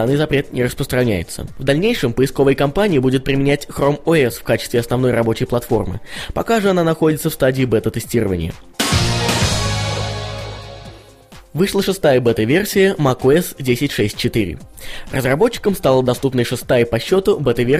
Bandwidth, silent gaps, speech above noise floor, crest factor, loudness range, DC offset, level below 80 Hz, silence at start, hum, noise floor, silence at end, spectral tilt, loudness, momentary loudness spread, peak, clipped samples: 15.5 kHz; none; 26 dB; 16 dB; 3 LU; under 0.1%; -36 dBFS; 0 s; none; -42 dBFS; 0 s; -5.5 dB/octave; -17 LUFS; 10 LU; 0 dBFS; under 0.1%